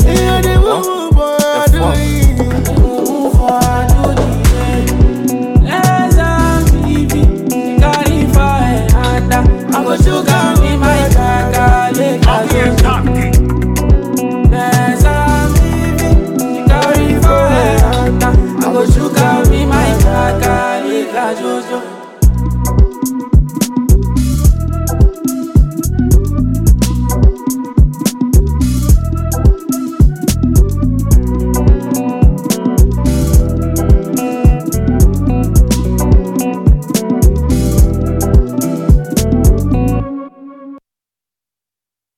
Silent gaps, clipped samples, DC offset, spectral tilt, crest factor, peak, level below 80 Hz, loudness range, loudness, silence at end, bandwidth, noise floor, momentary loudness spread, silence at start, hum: none; under 0.1%; under 0.1%; -6 dB/octave; 10 dB; 0 dBFS; -14 dBFS; 3 LU; -12 LUFS; 1.4 s; 16 kHz; -87 dBFS; 5 LU; 0 s; none